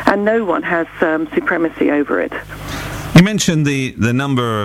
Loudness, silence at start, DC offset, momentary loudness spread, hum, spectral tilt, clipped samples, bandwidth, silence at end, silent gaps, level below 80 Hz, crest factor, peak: -16 LUFS; 0 s; under 0.1%; 13 LU; none; -5.5 dB/octave; 0.2%; 16 kHz; 0 s; none; -40 dBFS; 16 dB; 0 dBFS